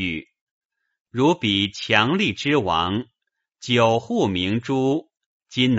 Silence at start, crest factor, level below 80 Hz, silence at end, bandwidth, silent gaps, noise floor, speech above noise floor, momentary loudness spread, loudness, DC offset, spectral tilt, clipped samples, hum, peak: 0 s; 22 dB; -54 dBFS; 0 s; 8 kHz; 0.41-0.70 s, 1.00-1.05 s, 5.26-5.40 s; -80 dBFS; 59 dB; 12 LU; -21 LUFS; under 0.1%; -3.5 dB/octave; under 0.1%; none; 0 dBFS